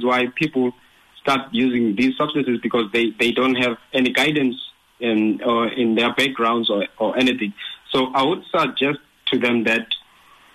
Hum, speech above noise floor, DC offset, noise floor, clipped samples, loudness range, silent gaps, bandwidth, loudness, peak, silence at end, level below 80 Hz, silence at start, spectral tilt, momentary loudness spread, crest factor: none; 32 dB; under 0.1%; -51 dBFS; under 0.1%; 1 LU; none; 13 kHz; -20 LUFS; -8 dBFS; 0.55 s; -60 dBFS; 0 s; -5 dB/octave; 7 LU; 14 dB